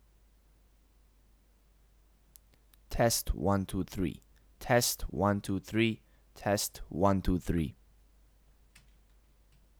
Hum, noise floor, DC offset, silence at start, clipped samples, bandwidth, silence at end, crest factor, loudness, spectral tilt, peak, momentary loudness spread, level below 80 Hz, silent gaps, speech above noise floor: none; -64 dBFS; under 0.1%; 2.9 s; under 0.1%; over 20 kHz; 2.1 s; 22 dB; -32 LUFS; -4.5 dB/octave; -12 dBFS; 11 LU; -46 dBFS; none; 34 dB